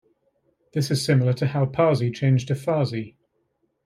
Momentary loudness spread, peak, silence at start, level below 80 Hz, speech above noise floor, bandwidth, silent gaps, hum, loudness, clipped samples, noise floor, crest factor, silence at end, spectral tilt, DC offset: 9 LU; -8 dBFS; 0.75 s; -62 dBFS; 50 dB; 14.5 kHz; none; none; -23 LUFS; under 0.1%; -71 dBFS; 16 dB; 0.75 s; -6.5 dB/octave; under 0.1%